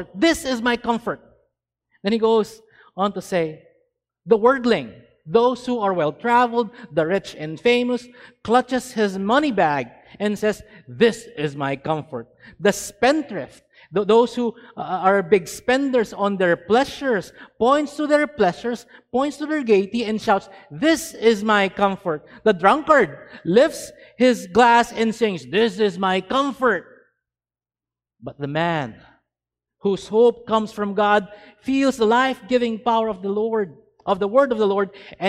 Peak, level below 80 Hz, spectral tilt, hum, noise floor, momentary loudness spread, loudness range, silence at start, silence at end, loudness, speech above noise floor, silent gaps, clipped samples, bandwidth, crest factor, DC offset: 0 dBFS; -56 dBFS; -5 dB/octave; none; under -90 dBFS; 11 LU; 5 LU; 0 s; 0 s; -20 LUFS; over 70 dB; none; under 0.1%; 15.5 kHz; 20 dB; under 0.1%